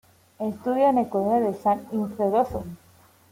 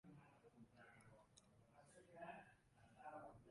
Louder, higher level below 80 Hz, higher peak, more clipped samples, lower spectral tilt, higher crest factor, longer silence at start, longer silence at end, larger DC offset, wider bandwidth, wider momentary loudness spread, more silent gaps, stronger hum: first, -24 LUFS vs -63 LUFS; first, -54 dBFS vs -84 dBFS; first, -10 dBFS vs -44 dBFS; neither; first, -8 dB/octave vs -5.5 dB/octave; about the same, 16 dB vs 20 dB; first, 0.4 s vs 0.05 s; first, 0.55 s vs 0 s; neither; first, 16.5 kHz vs 11 kHz; about the same, 11 LU vs 10 LU; neither; neither